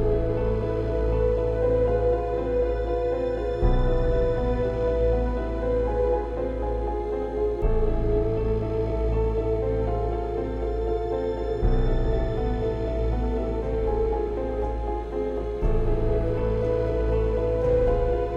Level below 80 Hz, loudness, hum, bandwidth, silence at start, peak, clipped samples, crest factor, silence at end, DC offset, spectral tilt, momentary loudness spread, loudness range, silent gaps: -28 dBFS; -26 LUFS; none; 5.6 kHz; 0 s; -8 dBFS; under 0.1%; 14 dB; 0 s; under 0.1%; -9.5 dB/octave; 5 LU; 2 LU; none